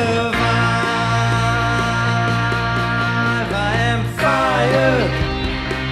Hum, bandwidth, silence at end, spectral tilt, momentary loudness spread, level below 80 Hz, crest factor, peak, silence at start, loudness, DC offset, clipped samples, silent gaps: none; 12.5 kHz; 0 s; -5.5 dB/octave; 4 LU; -32 dBFS; 14 dB; -4 dBFS; 0 s; -17 LUFS; under 0.1%; under 0.1%; none